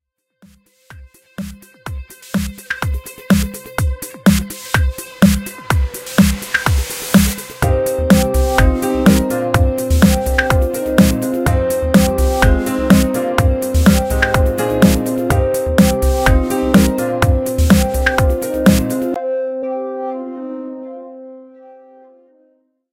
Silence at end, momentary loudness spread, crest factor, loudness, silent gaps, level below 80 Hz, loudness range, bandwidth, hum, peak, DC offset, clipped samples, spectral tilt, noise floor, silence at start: 1.2 s; 14 LU; 16 dB; -15 LUFS; none; -22 dBFS; 9 LU; 17 kHz; none; 0 dBFS; under 0.1%; under 0.1%; -5.5 dB/octave; -58 dBFS; 0.9 s